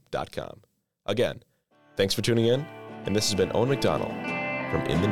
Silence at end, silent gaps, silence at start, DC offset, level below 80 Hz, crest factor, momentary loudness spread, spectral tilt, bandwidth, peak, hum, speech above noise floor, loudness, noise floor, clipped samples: 0 s; none; 0.1 s; under 0.1%; -54 dBFS; 16 dB; 14 LU; -5 dB/octave; 17.5 kHz; -10 dBFS; none; 34 dB; -27 LUFS; -60 dBFS; under 0.1%